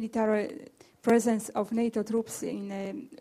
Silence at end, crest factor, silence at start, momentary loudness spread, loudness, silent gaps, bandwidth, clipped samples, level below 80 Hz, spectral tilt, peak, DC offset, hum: 0.05 s; 18 dB; 0 s; 12 LU; -30 LUFS; none; 15.5 kHz; under 0.1%; -70 dBFS; -5.5 dB/octave; -10 dBFS; under 0.1%; none